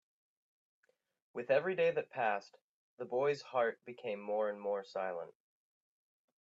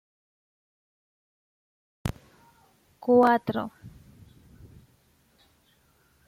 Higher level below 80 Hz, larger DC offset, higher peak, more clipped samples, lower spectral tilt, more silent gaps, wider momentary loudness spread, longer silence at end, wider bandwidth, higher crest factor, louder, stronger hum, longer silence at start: second, under -90 dBFS vs -56 dBFS; neither; second, -18 dBFS vs -10 dBFS; neither; second, -5.5 dB/octave vs -7 dB/octave; first, 2.62-2.98 s vs none; second, 13 LU vs 18 LU; second, 1.15 s vs 2.4 s; second, 7.8 kHz vs 15.5 kHz; about the same, 20 dB vs 22 dB; second, -37 LUFS vs -25 LUFS; neither; second, 1.35 s vs 2.05 s